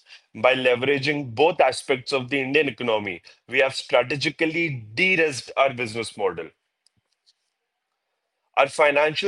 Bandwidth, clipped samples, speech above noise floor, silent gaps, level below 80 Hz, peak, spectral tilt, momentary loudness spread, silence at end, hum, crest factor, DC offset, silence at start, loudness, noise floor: 11.5 kHz; under 0.1%; 57 dB; none; -68 dBFS; -2 dBFS; -4 dB/octave; 9 LU; 0 s; none; 20 dB; under 0.1%; 0.1 s; -22 LUFS; -79 dBFS